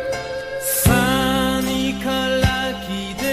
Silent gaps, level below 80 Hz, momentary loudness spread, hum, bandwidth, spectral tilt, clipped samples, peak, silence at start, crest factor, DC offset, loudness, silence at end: none; -32 dBFS; 10 LU; none; 16 kHz; -4 dB/octave; under 0.1%; -2 dBFS; 0 s; 18 dB; under 0.1%; -19 LUFS; 0 s